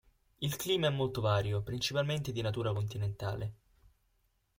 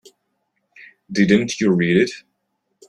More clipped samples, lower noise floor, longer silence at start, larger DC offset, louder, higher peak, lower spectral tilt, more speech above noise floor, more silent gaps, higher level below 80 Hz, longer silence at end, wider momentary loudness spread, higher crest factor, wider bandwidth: neither; about the same, -75 dBFS vs -73 dBFS; second, 0.4 s vs 1.1 s; neither; second, -34 LUFS vs -18 LUFS; second, -16 dBFS vs -2 dBFS; about the same, -5.5 dB/octave vs -6 dB/octave; second, 42 dB vs 56 dB; neither; about the same, -58 dBFS vs -56 dBFS; first, 1.05 s vs 0.7 s; second, 7 LU vs 10 LU; about the same, 18 dB vs 18 dB; first, 16.5 kHz vs 10.5 kHz